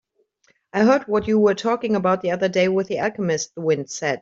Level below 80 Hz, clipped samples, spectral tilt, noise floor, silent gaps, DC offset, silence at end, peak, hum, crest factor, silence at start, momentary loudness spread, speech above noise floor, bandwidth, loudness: -58 dBFS; under 0.1%; -5 dB/octave; -64 dBFS; none; under 0.1%; 0.05 s; -6 dBFS; none; 16 dB; 0.75 s; 6 LU; 44 dB; 7.8 kHz; -21 LUFS